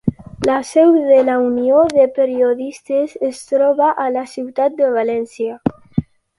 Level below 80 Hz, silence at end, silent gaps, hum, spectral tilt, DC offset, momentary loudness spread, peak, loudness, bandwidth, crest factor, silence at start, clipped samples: -48 dBFS; 0.35 s; none; none; -7 dB/octave; under 0.1%; 12 LU; 0 dBFS; -16 LUFS; 11.5 kHz; 16 dB; 0.05 s; under 0.1%